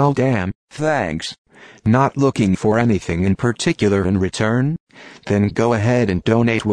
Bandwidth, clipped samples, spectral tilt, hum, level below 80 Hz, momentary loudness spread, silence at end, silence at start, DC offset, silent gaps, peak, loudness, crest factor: 10.5 kHz; under 0.1%; -6.5 dB/octave; none; -44 dBFS; 7 LU; 0 s; 0 s; 0.1%; 0.55-0.68 s, 1.38-1.45 s, 4.80-4.87 s; -2 dBFS; -18 LUFS; 14 dB